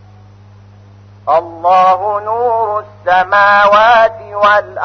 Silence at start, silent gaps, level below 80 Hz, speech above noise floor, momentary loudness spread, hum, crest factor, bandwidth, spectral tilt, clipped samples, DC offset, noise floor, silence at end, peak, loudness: 1.25 s; none; -50 dBFS; 28 dB; 9 LU; 50 Hz at -40 dBFS; 12 dB; 6.4 kHz; -4.5 dB/octave; under 0.1%; under 0.1%; -39 dBFS; 0 s; 0 dBFS; -11 LUFS